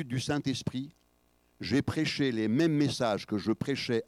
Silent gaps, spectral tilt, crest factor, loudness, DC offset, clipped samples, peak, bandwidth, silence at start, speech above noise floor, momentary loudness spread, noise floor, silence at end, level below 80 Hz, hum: none; -5.5 dB/octave; 14 dB; -30 LUFS; under 0.1%; under 0.1%; -16 dBFS; 14.5 kHz; 0 s; 39 dB; 10 LU; -69 dBFS; 0.05 s; -62 dBFS; 60 Hz at -55 dBFS